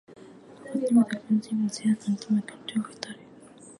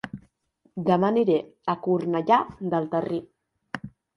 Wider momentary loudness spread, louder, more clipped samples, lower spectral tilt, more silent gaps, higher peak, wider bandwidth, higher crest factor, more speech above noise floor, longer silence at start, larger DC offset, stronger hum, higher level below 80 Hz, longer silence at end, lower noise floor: about the same, 17 LU vs 17 LU; about the same, -27 LUFS vs -25 LUFS; neither; second, -6 dB/octave vs -8.5 dB/octave; neither; about the same, -10 dBFS vs -8 dBFS; about the same, 11.5 kHz vs 10.5 kHz; about the same, 18 dB vs 18 dB; second, 23 dB vs 43 dB; about the same, 0.1 s vs 0.05 s; neither; neither; second, -72 dBFS vs -64 dBFS; second, 0.1 s vs 0.3 s; second, -50 dBFS vs -67 dBFS